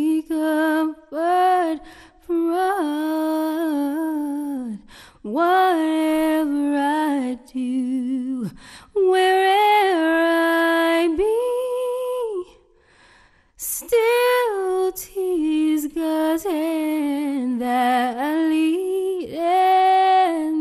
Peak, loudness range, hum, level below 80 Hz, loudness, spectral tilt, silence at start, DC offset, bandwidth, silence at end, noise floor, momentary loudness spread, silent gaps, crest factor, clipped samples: -8 dBFS; 5 LU; none; -56 dBFS; -20 LUFS; -3.5 dB/octave; 0 s; under 0.1%; 13.5 kHz; 0 s; -54 dBFS; 10 LU; none; 12 dB; under 0.1%